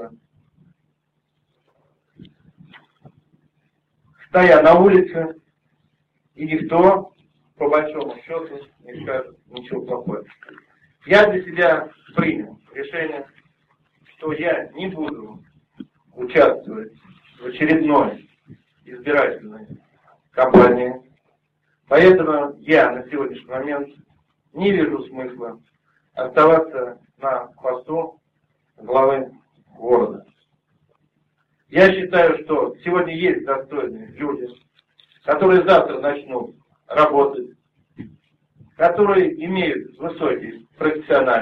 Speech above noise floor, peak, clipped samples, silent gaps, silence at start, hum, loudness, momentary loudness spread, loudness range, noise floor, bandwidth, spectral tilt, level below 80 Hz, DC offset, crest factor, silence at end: 54 dB; 0 dBFS; under 0.1%; none; 0 s; none; -18 LUFS; 20 LU; 8 LU; -71 dBFS; 6.6 kHz; -7.5 dB/octave; -54 dBFS; under 0.1%; 20 dB; 0 s